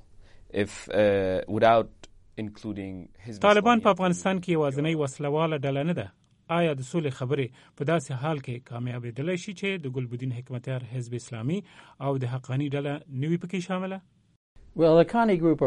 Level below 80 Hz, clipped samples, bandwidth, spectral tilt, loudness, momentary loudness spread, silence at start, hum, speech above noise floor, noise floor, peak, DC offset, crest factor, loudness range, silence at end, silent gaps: -58 dBFS; under 0.1%; 11.5 kHz; -6.5 dB/octave; -27 LUFS; 15 LU; 0.2 s; none; 24 dB; -50 dBFS; -6 dBFS; under 0.1%; 20 dB; 8 LU; 0 s; 14.36-14.55 s